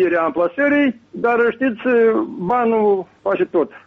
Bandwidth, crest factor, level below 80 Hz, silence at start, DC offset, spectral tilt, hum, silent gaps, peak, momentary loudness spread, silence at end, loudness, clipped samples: 4.6 kHz; 10 dB; -60 dBFS; 0 s; under 0.1%; -8 dB/octave; none; none; -8 dBFS; 5 LU; 0.1 s; -18 LUFS; under 0.1%